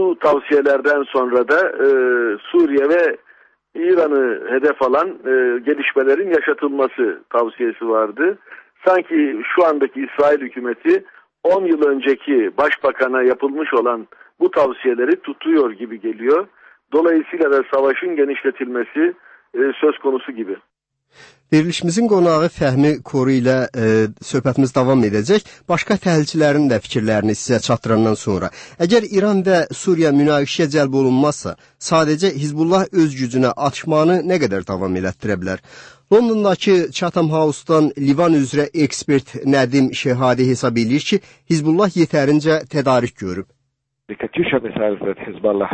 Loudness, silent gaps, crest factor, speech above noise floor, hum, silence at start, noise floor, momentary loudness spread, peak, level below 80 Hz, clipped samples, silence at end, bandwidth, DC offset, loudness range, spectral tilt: -17 LUFS; none; 14 dB; 55 dB; none; 0 s; -72 dBFS; 7 LU; -2 dBFS; -56 dBFS; under 0.1%; 0 s; 8.8 kHz; under 0.1%; 2 LU; -6 dB/octave